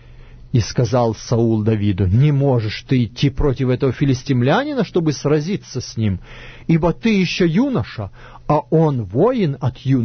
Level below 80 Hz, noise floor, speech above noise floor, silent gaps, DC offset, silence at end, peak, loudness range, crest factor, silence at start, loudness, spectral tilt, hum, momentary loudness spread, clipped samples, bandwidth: -36 dBFS; -39 dBFS; 22 dB; none; under 0.1%; 0 s; -4 dBFS; 2 LU; 14 dB; 0.1 s; -18 LUFS; -7 dB/octave; none; 8 LU; under 0.1%; 6.6 kHz